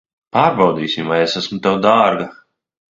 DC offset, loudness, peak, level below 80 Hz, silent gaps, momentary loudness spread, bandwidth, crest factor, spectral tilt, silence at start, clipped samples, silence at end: under 0.1%; -16 LUFS; 0 dBFS; -56 dBFS; none; 8 LU; 7.8 kHz; 16 dB; -5.5 dB/octave; 0.35 s; under 0.1%; 0.6 s